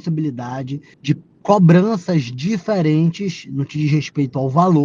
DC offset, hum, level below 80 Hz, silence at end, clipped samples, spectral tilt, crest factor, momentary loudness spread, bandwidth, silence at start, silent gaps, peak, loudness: under 0.1%; none; -58 dBFS; 0 s; under 0.1%; -8 dB/octave; 18 dB; 13 LU; 7.2 kHz; 0.05 s; none; 0 dBFS; -18 LUFS